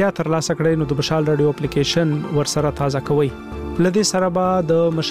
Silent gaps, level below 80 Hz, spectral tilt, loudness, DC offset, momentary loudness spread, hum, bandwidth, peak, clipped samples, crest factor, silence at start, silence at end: none; -40 dBFS; -5.5 dB/octave; -19 LUFS; 0.3%; 4 LU; none; 15 kHz; -6 dBFS; under 0.1%; 12 dB; 0 s; 0 s